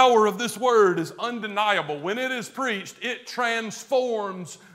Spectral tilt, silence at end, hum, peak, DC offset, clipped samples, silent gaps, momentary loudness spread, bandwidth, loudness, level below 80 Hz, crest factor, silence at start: -3.5 dB/octave; 0.2 s; none; -4 dBFS; under 0.1%; under 0.1%; none; 11 LU; 16 kHz; -24 LUFS; -80 dBFS; 20 dB; 0 s